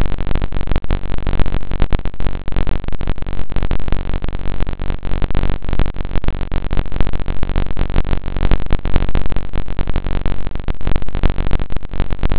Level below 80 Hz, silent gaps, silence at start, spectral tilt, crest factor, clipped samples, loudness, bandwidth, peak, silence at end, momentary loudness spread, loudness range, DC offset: -20 dBFS; none; 0 s; -10 dB/octave; 10 dB; under 0.1%; -23 LUFS; 4 kHz; 0 dBFS; 0 s; 5 LU; 2 LU; under 0.1%